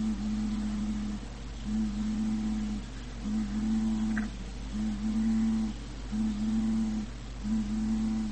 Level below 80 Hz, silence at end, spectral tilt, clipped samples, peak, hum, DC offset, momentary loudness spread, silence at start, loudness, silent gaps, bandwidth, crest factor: -40 dBFS; 0 s; -6.5 dB/octave; under 0.1%; -20 dBFS; none; 0.4%; 10 LU; 0 s; -32 LUFS; none; 8.8 kHz; 12 dB